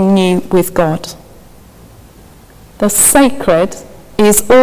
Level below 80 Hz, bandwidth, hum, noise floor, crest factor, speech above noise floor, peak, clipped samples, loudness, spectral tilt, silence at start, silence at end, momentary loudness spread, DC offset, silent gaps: -38 dBFS; 16 kHz; none; -39 dBFS; 12 dB; 29 dB; 0 dBFS; under 0.1%; -11 LUFS; -4 dB/octave; 0 s; 0 s; 15 LU; under 0.1%; none